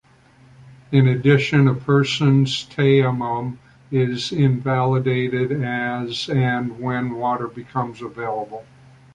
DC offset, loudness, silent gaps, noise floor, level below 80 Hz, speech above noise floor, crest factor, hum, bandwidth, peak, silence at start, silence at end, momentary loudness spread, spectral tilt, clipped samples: under 0.1%; -20 LUFS; none; -51 dBFS; -54 dBFS; 32 dB; 18 dB; none; 9 kHz; -2 dBFS; 0.65 s; 0.5 s; 11 LU; -7 dB/octave; under 0.1%